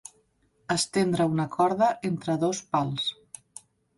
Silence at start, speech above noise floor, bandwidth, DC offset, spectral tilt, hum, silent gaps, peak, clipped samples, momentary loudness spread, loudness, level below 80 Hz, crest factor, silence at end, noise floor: 0.7 s; 42 dB; 11.5 kHz; under 0.1%; -5 dB/octave; none; none; -10 dBFS; under 0.1%; 21 LU; -26 LUFS; -64 dBFS; 18 dB; 0.85 s; -67 dBFS